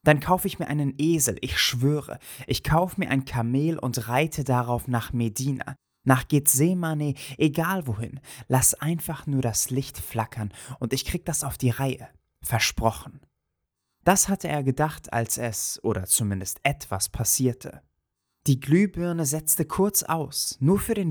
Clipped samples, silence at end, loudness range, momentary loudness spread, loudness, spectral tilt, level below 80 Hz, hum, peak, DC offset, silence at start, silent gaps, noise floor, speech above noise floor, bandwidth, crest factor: under 0.1%; 0 s; 4 LU; 9 LU; -25 LUFS; -4.5 dB/octave; -46 dBFS; none; -4 dBFS; under 0.1%; 0.05 s; none; -80 dBFS; 56 dB; over 20 kHz; 22 dB